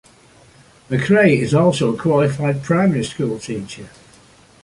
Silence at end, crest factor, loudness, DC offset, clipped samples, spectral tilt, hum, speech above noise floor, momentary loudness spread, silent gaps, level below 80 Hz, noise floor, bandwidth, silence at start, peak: 0.75 s; 18 dB; -17 LUFS; under 0.1%; under 0.1%; -6.5 dB/octave; none; 32 dB; 14 LU; none; -52 dBFS; -49 dBFS; 11.5 kHz; 0.9 s; -2 dBFS